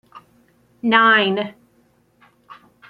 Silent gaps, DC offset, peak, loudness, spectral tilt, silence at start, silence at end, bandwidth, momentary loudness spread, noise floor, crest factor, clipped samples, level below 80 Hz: none; under 0.1%; -2 dBFS; -16 LUFS; -6.5 dB/octave; 0.15 s; 0.35 s; 6 kHz; 14 LU; -59 dBFS; 20 dB; under 0.1%; -70 dBFS